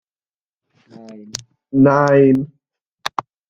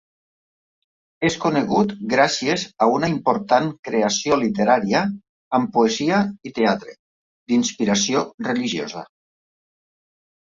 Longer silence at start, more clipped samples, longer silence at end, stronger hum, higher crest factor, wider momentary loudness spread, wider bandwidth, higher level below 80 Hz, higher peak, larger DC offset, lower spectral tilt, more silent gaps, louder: about the same, 1.1 s vs 1.2 s; neither; second, 0.4 s vs 1.4 s; neither; about the same, 18 dB vs 20 dB; first, 19 LU vs 7 LU; first, 9.4 kHz vs 7.8 kHz; about the same, -56 dBFS vs -58 dBFS; about the same, -2 dBFS vs -2 dBFS; neither; first, -6.5 dB/octave vs -4 dB/octave; second, 2.81-2.85 s, 2.92-2.96 s vs 3.79-3.83 s, 5.29-5.51 s, 6.99-7.46 s, 8.34-8.38 s; first, -15 LUFS vs -20 LUFS